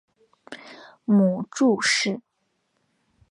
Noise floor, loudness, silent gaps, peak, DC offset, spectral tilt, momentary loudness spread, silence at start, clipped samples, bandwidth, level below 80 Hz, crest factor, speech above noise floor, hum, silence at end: -73 dBFS; -21 LUFS; none; -10 dBFS; under 0.1%; -4.5 dB/octave; 22 LU; 0.5 s; under 0.1%; 11 kHz; -72 dBFS; 16 dB; 52 dB; none; 1.1 s